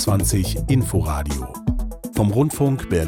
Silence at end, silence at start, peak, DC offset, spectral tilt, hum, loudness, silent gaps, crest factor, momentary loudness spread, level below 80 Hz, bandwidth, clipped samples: 0 s; 0 s; -8 dBFS; under 0.1%; -6 dB/octave; none; -21 LUFS; none; 12 dB; 8 LU; -30 dBFS; 18 kHz; under 0.1%